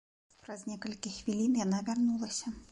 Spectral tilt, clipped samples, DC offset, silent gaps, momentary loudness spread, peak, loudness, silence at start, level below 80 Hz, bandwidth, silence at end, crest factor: -4.5 dB/octave; under 0.1%; under 0.1%; none; 12 LU; -20 dBFS; -34 LUFS; 0.45 s; -64 dBFS; 11 kHz; 0.05 s; 14 dB